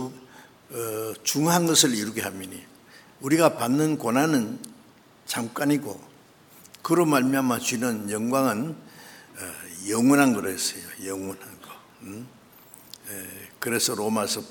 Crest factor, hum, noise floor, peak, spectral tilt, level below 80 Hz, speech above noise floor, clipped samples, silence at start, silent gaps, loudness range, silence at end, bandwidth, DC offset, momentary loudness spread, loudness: 24 dB; none; -54 dBFS; -2 dBFS; -4 dB/octave; -70 dBFS; 29 dB; under 0.1%; 0 s; none; 7 LU; 0 s; over 20 kHz; under 0.1%; 22 LU; -24 LUFS